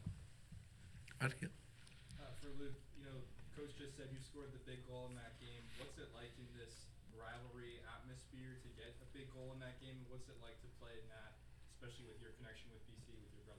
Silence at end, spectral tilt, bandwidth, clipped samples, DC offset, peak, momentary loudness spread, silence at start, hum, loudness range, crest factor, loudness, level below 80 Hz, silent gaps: 0 s; -5 dB/octave; 16.5 kHz; under 0.1%; under 0.1%; -24 dBFS; 8 LU; 0 s; none; 6 LU; 28 dB; -56 LUFS; -64 dBFS; none